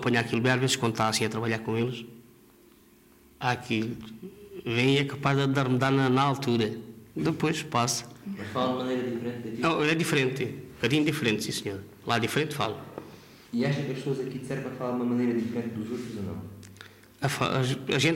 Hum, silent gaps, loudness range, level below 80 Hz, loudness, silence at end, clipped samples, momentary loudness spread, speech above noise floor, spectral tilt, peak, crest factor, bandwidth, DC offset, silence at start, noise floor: none; none; 5 LU; -62 dBFS; -28 LUFS; 0 s; under 0.1%; 15 LU; 30 dB; -5 dB/octave; -10 dBFS; 18 dB; 16 kHz; under 0.1%; 0 s; -57 dBFS